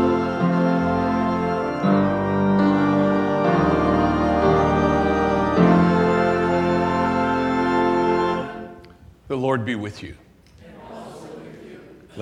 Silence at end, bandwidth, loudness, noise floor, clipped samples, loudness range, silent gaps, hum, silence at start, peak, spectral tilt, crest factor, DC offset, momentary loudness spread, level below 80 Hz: 0 s; 9.2 kHz; -20 LUFS; -47 dBFS; under 0.1%; 11 LU; none; none; 0 s; -2 dBFS; -8 dB/octave; 18 dB; under 0.1%; 20 LU; -42 dBFS